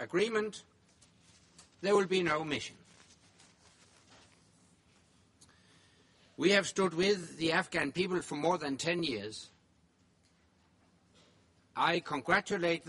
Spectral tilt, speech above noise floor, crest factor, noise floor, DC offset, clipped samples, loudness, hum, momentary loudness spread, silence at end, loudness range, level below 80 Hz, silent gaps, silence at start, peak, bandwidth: -4 dB/octave; 37 dB; 24 dB; -69 dBFS; under 0.1%; under 0.1%; -32 LUFS; none; 13 LU; 0 s; 8 LU; -70 dBFS; none; 0 s; -12 dBFS; 11.5 kHz